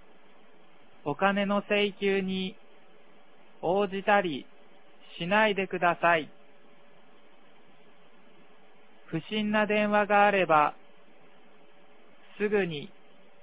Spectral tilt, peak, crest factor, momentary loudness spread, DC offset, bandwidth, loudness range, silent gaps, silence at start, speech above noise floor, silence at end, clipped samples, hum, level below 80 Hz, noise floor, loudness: -9 dB/octave; -8 dBFS; 22 dB; 15 LU; 0.4%; 4 kHz; 6 LU; none; 1.05 s; 33 dB; 0.55 s; under 0.1%; none; -72 dBFS; -59 dBFS; -27 LUFS